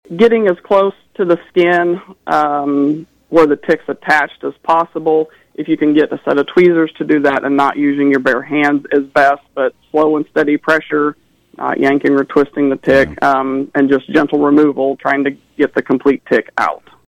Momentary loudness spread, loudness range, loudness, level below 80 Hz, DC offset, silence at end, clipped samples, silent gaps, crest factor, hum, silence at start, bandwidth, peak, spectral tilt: 7 LU; 2 LU; -14 LUFS; -50 dBFS; under 0.1%; 0.35 s; under 0.1%; none; 12 dB; none; 0.1 s; 10 kHz; -2 dBFS; -6.5 dB/octave